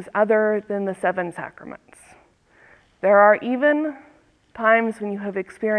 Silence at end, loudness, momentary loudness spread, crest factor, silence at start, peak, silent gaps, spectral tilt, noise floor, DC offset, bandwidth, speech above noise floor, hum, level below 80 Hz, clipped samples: 0 s; -20 LUFS; 16 LU; 20 dB; 0 s; -2 dBFS; none; -7 dB/octave; -55 dBFS; under 0.1%; 11 kHz; 35 dB; none; -66 dBFS; under 0.1%